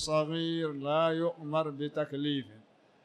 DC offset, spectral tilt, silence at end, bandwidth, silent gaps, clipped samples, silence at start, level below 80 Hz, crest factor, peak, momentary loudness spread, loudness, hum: under 0.1%; -5.5 dB/octave; 0.45 s; 12 kHz; none; under 0.1%; 0 s; -68 dBFS; 16 dB; -16 dBFS; 6 LU; -32 LUFS; none